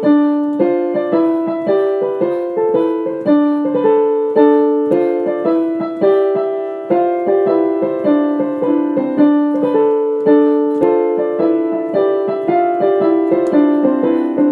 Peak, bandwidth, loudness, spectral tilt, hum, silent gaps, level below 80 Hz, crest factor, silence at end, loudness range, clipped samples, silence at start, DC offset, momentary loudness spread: 0 dBFS; 4.5 kHz; -15 LUFS; -9 dB/octave; none; none; -72 dBFS; 14 dB; 0 s; 2 LU; under 0.1%; 0 s; under 0.1%; 5 LU